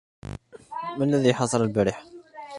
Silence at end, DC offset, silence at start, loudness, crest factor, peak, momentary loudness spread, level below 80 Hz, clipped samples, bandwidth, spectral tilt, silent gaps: 0 s; under 0.1%; 0.3 s; -24 LUFS; 20 dB; -6 dBFS; 21 LU; -52 dBFS; under 0.1%; 11.5 kHz; -6 dB/octave; none